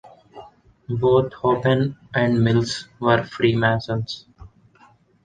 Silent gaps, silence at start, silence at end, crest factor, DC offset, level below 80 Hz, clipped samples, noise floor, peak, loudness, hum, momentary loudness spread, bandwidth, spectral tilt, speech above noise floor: none; 0.05 s; 0.75 s; 18 dB; under 0.1%; -50 dBFS; under 0.1%; -55 dBFS; -2 dBFS; -21 LUFS; none; 9 LU; 9.4 kHz; -6.5 dB/octave; 35 dB